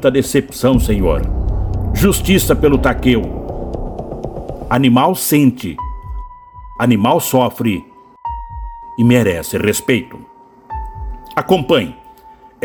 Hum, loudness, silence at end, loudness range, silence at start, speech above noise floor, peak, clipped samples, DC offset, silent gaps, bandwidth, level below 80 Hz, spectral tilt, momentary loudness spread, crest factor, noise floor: none; -15 LUFS; 0.15 s; 3 LU; 0 s; 29 dB; 0 dBFS; under 0.1%; under 0.1%; none; over 20 kHz; -26 dBFS; -5.5 dB/octave; 17 LU; 16 dB; -42 dBFS